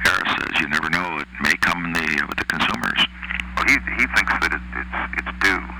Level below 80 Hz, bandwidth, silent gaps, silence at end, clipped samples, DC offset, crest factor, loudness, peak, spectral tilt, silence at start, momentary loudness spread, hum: -38 dBFS; over 20 kHz; none; 0 s; under 0.1%; under 0.1%; 16 dB; -20 LUFS; -4 dBFS; -3 dB/octave; 0 s; 8 LU; none